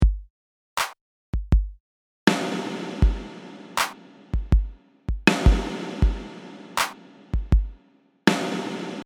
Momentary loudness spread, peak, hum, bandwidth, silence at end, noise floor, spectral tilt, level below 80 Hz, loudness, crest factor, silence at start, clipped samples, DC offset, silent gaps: 16 LU; 0 dBFS; none; 17.5 kHz; 0 s; -60 dBFS; -5 dB/octave; -26 dBFS; -25 LUFS; 24 dB; 0 s; under 0.1%; under 0.1%; 0.30-0.76 s, 1.01-1.33 s, 1.80-2.27 s